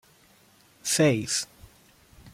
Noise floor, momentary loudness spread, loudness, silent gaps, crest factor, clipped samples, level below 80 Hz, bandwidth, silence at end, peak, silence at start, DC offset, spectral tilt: -59 dBFS; 13 LU; -25 LUFS; none; 20 dB; under 0.1%; -62 dBFS; 16.5 kHz; 0.05 s; -10 dBFS; 0.85 s; under 0.1%; -3.5 dB/octave